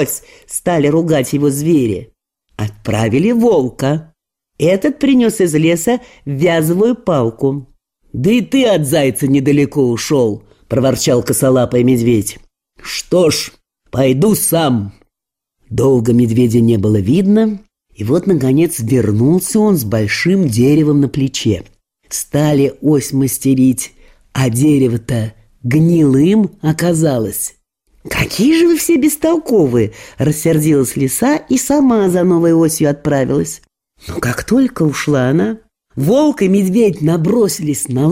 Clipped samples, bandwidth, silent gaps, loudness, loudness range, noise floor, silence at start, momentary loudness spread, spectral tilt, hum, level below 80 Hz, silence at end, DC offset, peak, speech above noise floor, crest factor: under 0.1%; 16 kHz; none; -13 LUFS; 2 LU; -80 dBFS; 0 s; 10 LU; -6 dB/octave; none; -44 dBFS; 0 s; under 0.1%; -2 dBFS; 67 dB; 12 dB